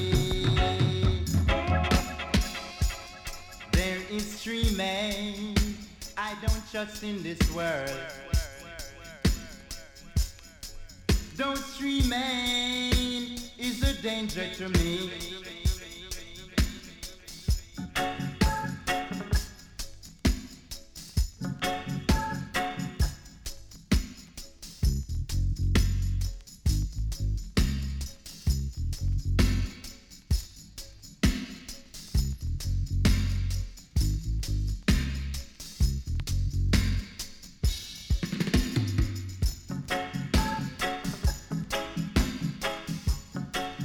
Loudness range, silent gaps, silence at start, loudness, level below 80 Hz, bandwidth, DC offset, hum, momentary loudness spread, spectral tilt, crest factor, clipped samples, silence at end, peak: 4 LU; none; 0 s; -30 LUFS; -32 dBFS; 18.5 kHz; under 0.1%; none; 15 LU; -5 dB/octave; 22 dB; under 0.1%; 0 s; -8 dBFS